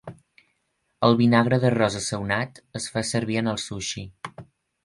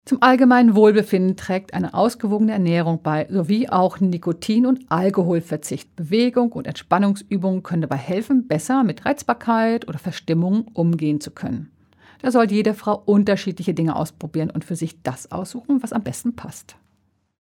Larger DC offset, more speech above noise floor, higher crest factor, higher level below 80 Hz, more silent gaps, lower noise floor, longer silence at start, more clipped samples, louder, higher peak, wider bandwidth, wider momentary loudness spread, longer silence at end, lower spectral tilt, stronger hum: neither; first, 50 dB vs 46 dB; about the same, 20 dB vs 18 dB; first, -54 dBFS vs -60 dBFS; neither; first, -73 dBFS vs -65 dBFS; about the same, 0.05 s vs 0.05 s; neither; second, -23 LUFS vs -20 LUFS; about the same, -4 dBFS vs -2 dBFS; second, 11.5 kHz vs 15.5 kHz; first, 17 LU vs 12 LU; second, 0.4 s vs 0.8 s; second, -5 dB/octave vs -6.5 dB/octave; neither